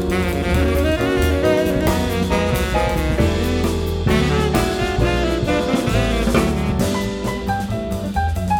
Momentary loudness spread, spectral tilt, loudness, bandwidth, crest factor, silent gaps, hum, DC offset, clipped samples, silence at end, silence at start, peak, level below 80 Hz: 5 LU; -6 dB/octave; -19 LUFS; 19 kHz; 14 dB; none; none; under 0.1%; under 0.1%; 0 s; 0 s; -4 dBFS; -26 dBFS